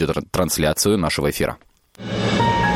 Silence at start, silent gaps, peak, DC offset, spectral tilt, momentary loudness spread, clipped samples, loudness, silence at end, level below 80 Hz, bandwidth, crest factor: 0 s; none; -4 dBFS; under 0.1%; -4.5 dB/octave; 10 LU; under 0.1%; -20 LUFS; 0 s; -38 dBFS; 16.5 kHz; 16 dB